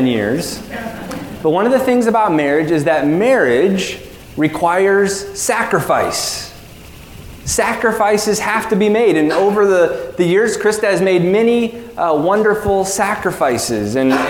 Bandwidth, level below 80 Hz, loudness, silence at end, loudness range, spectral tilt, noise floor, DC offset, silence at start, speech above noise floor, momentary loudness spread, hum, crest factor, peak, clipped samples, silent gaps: 18 kHz; -44 dBFS; -15 LUFS; 0 s; 3 LU; -4.5 dB/octave; -36 dBFS; under 0.1%; 0 s; 22 dB; 10 LU; none; 14 dB; 0 dBFS; under 0.1%; none